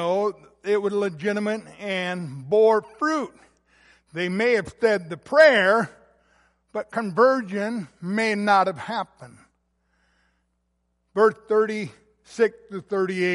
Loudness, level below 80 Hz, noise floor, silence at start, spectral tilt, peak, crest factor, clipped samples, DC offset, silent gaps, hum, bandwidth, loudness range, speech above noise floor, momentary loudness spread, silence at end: -22 LUFS; -66 dBFS; -73 dBFS; 0 s; -5.5 dB/octave; -2 dBFS; 20 dB; under 0.1%; under 0.1%; none; none; 11.5 kHz; 6 LU; 50 dB; 14 LU; 0 s